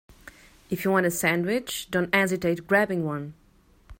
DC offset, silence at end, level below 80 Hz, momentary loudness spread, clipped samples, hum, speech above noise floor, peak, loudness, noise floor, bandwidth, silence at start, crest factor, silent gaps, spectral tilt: under 0.1%; 0.05 s; -56 dBFS; 10 LU; under 0.1%; none; 33 dB; -4 dBFS; -25 LUFS; -58 dBFS; 16.5 kHz; 0.25 s; 22 dB; none; -4.5 dB/octave